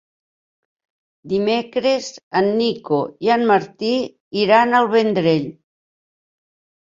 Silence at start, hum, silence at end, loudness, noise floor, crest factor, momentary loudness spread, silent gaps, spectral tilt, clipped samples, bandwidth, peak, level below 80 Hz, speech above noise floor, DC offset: 1.25 s; none; 1.35 s; -18 LUFS; under -90 dBFS; 18 dB; 8 LU; 2.23-2.31 s, 4.20-4.31 s; -5.5 dB/octave; under 0.1%; 7.6 kHz; -2 dBFS; -62 dBFS; over 72 dB; under 0.1%